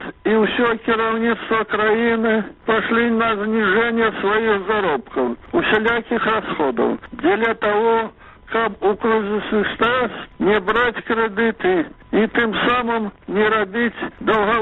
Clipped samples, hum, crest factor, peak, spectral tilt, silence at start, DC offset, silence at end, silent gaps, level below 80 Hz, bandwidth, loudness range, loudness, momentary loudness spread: under 0.1%; none; 16 dB; -2 dBFS; -7.5 dB/octave; 0 s; under 0.1%; 0 s; none; -48 dBFS; 4.1 kHz; 2 LU; -19 LUFS; 5 LU